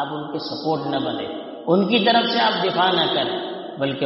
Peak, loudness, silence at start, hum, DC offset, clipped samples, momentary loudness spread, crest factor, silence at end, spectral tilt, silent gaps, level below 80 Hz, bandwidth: -4 dBFS; -21 LUFS; 0 s; none; under 0.1%; under 0.1%; 12 LU; 18 dB; 0 s; -2.5 dB/octave; none; -66 dBFS; 6 kHz